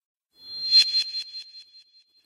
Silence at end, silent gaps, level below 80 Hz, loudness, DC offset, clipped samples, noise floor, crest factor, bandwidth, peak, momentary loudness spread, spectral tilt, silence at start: 0.65 s; none; -78 dBFS; -20 LUFS; under 0.1%; under 0.1%; -56 dBFS; 20 dB; 14.5 kHz; -8 dBFS; 21 LU; 3.5 dB/octave; 0.45 s